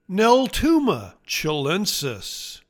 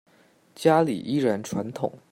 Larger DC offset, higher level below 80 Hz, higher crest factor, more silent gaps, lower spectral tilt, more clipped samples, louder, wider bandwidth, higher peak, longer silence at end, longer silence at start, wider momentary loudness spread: neither; first, -42 dBFS vs -66 dBFS; about the same, 18 dB vs 20 dB; neither; second, -4 dB/octave vs -6.5 dB/octave; neither; first, -21 LUFS vs -25 LUFS; first, 19 kHz vs 16 kHz; about the same, -4 dBFS vs -6 dBFS; about the same, 0.1 s vs 0.15 s; second, 0.1 s vs 0.6 s; about the same, 12 LU vs 11 LU